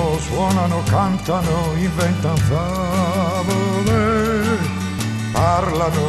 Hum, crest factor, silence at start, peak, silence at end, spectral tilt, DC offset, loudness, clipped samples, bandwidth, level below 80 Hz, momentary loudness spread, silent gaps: none; 14 dB; 0 s; -4 dBFS; 0 s; -6 dB/octave; under 0.1%; -19 LUFS; under 0.1%; 14 kHz; -34 dBFS; 4 LU; none